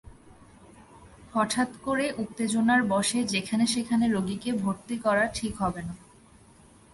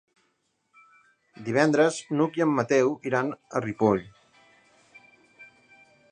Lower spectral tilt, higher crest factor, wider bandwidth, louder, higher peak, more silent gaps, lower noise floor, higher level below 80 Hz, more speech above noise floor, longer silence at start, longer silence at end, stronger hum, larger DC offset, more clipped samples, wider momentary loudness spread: second, -4 dB/octave vs -6 dB/octave; about the same, 18 dB vs 22 dB; first, 11.5 kHz vs 10 kHz; about the same, -27 LUFS vs -25 LUFS; second, -10 dBFS vs -6 dBFS; neither; second, -55 dBFS vs -73 dBFS; first, -56 dBFS vs -66 dBFS; second, 28 dB vs 49 dB; second, 0.05 s vs 1.4 s; first, 0.95 s vs 0.65 s; neither; neither; neither; about the same, 8 LU vs 8 LU